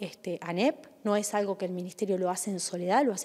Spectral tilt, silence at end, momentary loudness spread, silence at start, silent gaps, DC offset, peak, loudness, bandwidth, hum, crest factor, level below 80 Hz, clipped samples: -4.5 dB/octave; 0 s; 9 LU; 0 s; none; under 0.1%; -12 dBFS; -30 LUFS; 15.5 kHz; none; 18 dB; -82 dBFS; under 0.1%